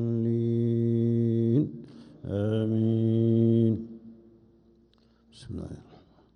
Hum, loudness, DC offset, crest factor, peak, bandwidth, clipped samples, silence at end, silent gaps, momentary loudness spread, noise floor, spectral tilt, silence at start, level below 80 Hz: none; -26 LUFS; under 0.1%; 14 dB; -12 dBFS; 4.9 kHz; under 0.1%; 0.55 s; none; 20 LU; -62 dBFS; -10.5 dB/octave; 0 s; -60 dBFS